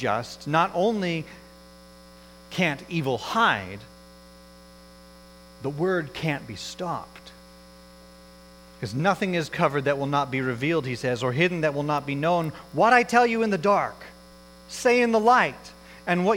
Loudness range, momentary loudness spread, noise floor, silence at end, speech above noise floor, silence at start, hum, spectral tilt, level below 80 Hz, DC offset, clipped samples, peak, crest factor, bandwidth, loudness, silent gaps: 9 LU; 16 LU; -49 dBFS; 0 s; 25 dB; 0 s; none; -5.5 dB/octave; -56 dBFS; under 0.1%; under 0.1%; -4 dBFS; 22 dB; 17 kHz; -24 LUFS; none